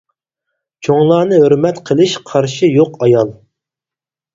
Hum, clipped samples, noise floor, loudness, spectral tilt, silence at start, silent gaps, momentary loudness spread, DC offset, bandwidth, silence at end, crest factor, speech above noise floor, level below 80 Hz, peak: none; under 0.1%; -89 dBFS; -12 LUFS; -6.5 dB/octave; 0.8 s; none; 6 LU; under 0.1%; 7.8 kHz; 1 s; 14 dB; 77 dB; -54 dBFS; 0 dBFS